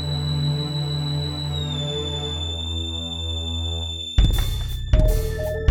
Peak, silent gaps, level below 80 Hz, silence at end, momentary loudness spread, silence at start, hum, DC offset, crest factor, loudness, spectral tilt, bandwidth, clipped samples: -4 dBFS; none; -26 dBFS; 0 s; 6 LU; 0 s; none; under 0.1%; 18 dB; -24 LUFS; -5.5 dB/octave; 17.5 kHz; under 0.1%